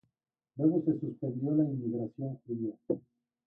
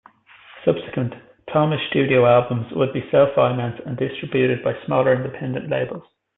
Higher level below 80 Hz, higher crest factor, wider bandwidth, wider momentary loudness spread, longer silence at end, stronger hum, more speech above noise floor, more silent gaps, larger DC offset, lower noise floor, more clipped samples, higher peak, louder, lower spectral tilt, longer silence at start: second, -74 dBFS vs -58 dBFS; about the same, 18 dB vs 18 dB; second, 1.7 kHz vs 4 kHz; about the same, 9 LU vs 11 LU; first, 0.5 s vs 0.35 s; neither; first, 53 dB vs 29 dB; neither; neither; first, -85 dBFS vs -48 dBFS; neither; second, -16 dBFS vs -4 dBFS; second, -33 LUFS vs -20 LUFS; first, -14.5 dB/octave vs -11.5 dB/octave; about the same, 0.55 s vs 0.55 s